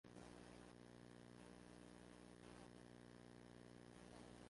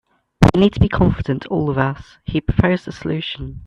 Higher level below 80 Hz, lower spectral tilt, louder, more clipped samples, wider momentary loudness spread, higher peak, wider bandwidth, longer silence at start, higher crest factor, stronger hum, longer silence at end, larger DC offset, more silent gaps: second, -76 dBFS vs -32 dBFS; second, -5 dB/octave vs -7.5 dB/octave; second, -63 LUFS vs -18 LUFS; neither; second, 2 LU vs 10 LU; second, -48 dBFS vs 0 dBFS; first, 11.5 kHz vs 9.6 kHz; second, 0.05 s vs 0.4 s; about the same, 16 dB vs 18 dB; first, 60 Hz at -65 dBFS vs none; about the same, 0 s vs 0 s; neither; neither